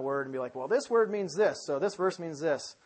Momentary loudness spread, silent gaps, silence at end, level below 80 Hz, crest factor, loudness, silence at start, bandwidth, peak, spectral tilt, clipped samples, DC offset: 6 LU; none; 0.15 s; -80 dBFS; 16 dB; -30 LUFS; 0 s; 8.8 kHz; -14 dBFS; -4.5 dB/octave; under 0.1%; under 0.1%